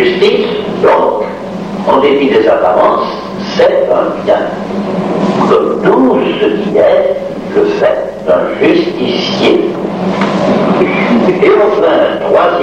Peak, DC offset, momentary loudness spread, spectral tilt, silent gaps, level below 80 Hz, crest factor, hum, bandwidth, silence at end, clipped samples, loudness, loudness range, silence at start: 0 dBFS; under 0.1%; 7 LU; -6.5 dB/octave; none; -44 dBFS; 10 dB; none; 9.4 kHz; 0 s; under 0.1%; -10 LUFS; 1 LU; 0 s